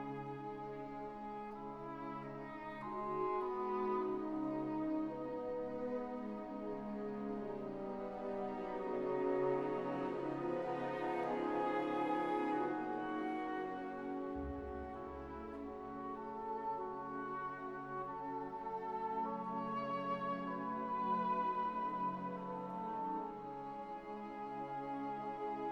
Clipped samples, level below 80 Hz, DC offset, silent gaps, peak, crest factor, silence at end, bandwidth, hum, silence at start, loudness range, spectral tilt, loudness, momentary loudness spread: under 0.1%; -64 dBFS; under 0.1%; none; -24 dBFS; 16 dB; 0 s; 18 kHz; none; 0 s; 6 LU; -8 dB/octave; -42 LUFS; 10 LU